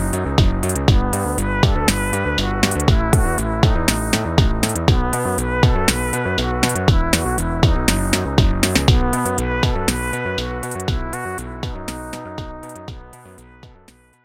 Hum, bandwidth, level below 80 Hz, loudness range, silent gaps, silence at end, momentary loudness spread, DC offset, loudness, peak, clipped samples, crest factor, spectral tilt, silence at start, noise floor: none; 17 kHz; -24 dBFS; 9 LU; none; 0.55 s; 12 LU; under 0.1%; -19 LUFS; -2 dBFS; under 0.1%; 18 dB; -4.5 dB/octave; 0 s; -50 dBFS